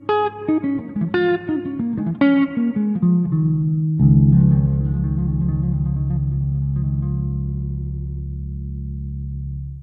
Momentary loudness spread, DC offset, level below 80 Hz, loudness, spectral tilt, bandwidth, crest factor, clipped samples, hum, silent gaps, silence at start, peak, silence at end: 14 LU; under 0.1%; -30 dBFS; -20 LUFS; -12 dB/octave; 4.9 kHz; 16 dB; under 0.1%; none; none; 0 s; -4 dBFS; 0 s